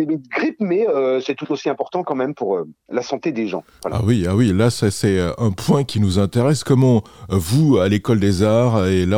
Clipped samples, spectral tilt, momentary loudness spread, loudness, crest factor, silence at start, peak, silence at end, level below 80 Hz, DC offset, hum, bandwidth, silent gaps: under 0.1%; -6.5 dB/octave; 8 LU; -18 LUFS; 14 dB; 0 s; -4 dBFS; 0 s; -50 dBFS; under 0.1%; none; 17 kHz; none